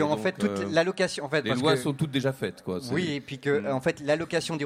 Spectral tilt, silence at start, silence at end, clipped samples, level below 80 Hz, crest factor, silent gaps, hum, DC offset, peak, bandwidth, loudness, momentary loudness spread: -5.5 dB/octave; 0 s; 0 s; under 0.1%; -64 dBFS; 18 dB; none; none; under 0.1%; -10 dBFS; 16 kHz; -27 LUFS; 7 LU